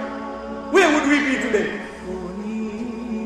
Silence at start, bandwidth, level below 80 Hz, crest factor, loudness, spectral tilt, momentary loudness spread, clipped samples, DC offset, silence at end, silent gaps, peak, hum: 0 s; 13 kHz; -48 dBFS; 18 dB; -21 LUFS; -4 dB/octave; 15 LU; under 0.1%; under 0.1%; 0 s; none; -4 dBFS; none